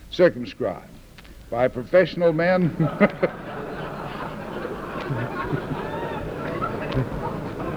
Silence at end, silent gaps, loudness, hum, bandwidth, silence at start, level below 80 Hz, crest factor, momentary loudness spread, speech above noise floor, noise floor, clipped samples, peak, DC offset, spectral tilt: 0 s; none; -25 LUFS; none; 20 kHz; 0 s; -44 dBFS; 22 dB; 12 LU; 23 dB; -44 dBFS; under 0.1%; -4 dBFS; under 0.1%; -7.5 dB/octave